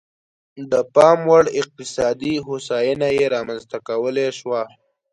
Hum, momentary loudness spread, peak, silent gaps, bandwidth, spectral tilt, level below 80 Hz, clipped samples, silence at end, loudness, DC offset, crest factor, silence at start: none; 13 LU; 0 dBFS; none; 11 kHz; -5 dB/octave; -56 dBFS; under 0.1%; 0.45 s; -19 LUFS; under 0.1%; 20 dB; 0.55 s